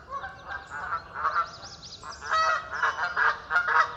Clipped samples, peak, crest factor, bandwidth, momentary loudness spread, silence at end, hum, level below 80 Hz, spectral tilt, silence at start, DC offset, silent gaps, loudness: under 0.1%; -10 dBFS; 20 dB; 8.6 kHz; 16 LU; 0 s; none; -58 dBFS; -1.5 dB/octave; 0 s; under 0.1%; none; -27 LUFS